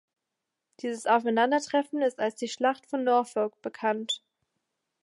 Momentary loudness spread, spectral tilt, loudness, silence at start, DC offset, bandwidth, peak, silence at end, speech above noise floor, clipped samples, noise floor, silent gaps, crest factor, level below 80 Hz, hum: 8 LU; -3.5 dB/octave; -28 LUFS; 0.85 s; under 0.1%; 11.5 kHz; -12 dBFS; 0.85 s; 58 dB; under 0.1%; -85 dBFS; none; 18 dB; -86 dBFS; none